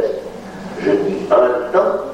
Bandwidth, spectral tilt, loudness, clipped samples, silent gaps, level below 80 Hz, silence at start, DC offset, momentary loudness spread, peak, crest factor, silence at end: 11 kHz; -6.5 dB/octave; -16 LUFS; under 0.1%; none; -50 dBFS; 0 s; under 0.1%; 16 LU; -2 dBFS; 14 dB; 0 s